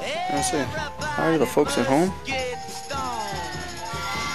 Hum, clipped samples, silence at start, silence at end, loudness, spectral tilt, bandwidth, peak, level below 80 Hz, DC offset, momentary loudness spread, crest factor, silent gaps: none; under 0.1%; 0 s; 0 s; -25 LUFS; -4 dB/octave; 14 kHz; -6 dBFS; -46 dBFS; 0.9%; 10 LU; 20 dB; none